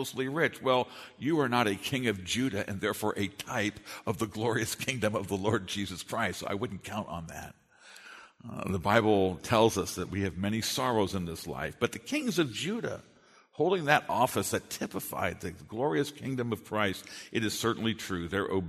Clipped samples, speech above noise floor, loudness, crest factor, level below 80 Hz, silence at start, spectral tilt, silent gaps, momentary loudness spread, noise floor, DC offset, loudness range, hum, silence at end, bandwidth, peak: under 0.1%; 22 dB; -31 LUFS; 24 dB; -60 dBFS; 0 s; -4.5 dB/octave; none; 13 LU; -53 dBFS; under 0.1%; 4 LU; none; 0 s; 13.5 kHz; -8 dBFS